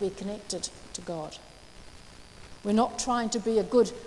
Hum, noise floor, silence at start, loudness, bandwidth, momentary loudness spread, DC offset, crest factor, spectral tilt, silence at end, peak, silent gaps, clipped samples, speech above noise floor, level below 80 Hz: none; -49 dBFS; 0 s; -29 LUFS; 12 kHz; 25 LU; under 0.1%; 20 dB; -4.5 dB/octave; 0 s; -10 dBFS; none; under 0.1%; 20 dB; -54 dBFS